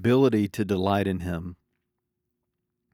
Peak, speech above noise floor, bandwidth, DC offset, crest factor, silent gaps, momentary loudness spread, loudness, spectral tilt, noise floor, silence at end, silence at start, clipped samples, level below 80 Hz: -10 dBFS; 57 dB; 16.5 kHz; under 0.1%; 18 dB; none; 13 LU; -25 LUFS; -7.5 dB/octave; -81 dBFS; 1.4 s; 0 s; under 0.1%; -60 dBFS